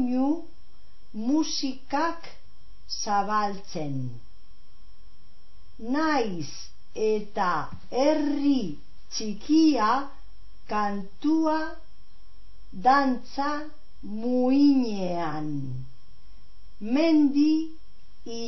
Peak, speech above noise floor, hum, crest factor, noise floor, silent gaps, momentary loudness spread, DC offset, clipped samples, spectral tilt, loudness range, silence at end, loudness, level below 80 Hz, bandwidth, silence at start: -8 dBFS; 31 dB; none; 18 dB; -56 dBFS; none; 18 LU; 3%; under 0.1%; -5 dB/octave; 6 LU; 0 s; -26 LUFS; -54 dBFS; 6.2 kHz; 0 s